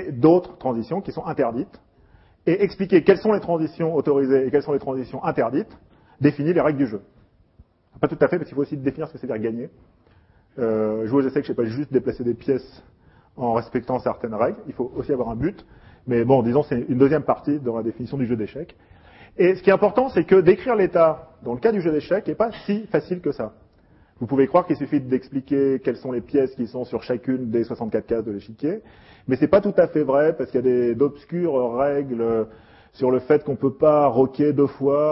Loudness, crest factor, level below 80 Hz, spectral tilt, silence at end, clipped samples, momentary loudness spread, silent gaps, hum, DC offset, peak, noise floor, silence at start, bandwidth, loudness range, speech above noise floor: -22 LUFS; 20 dB; -54 dBFS; -12 dB/octave; 0 s; under 0.1%; 11 LU; none; none; under 0.1%; -2 dBFS; -56 dBFS; 0 s; 5.8 kHz; 6 LU; 35 dB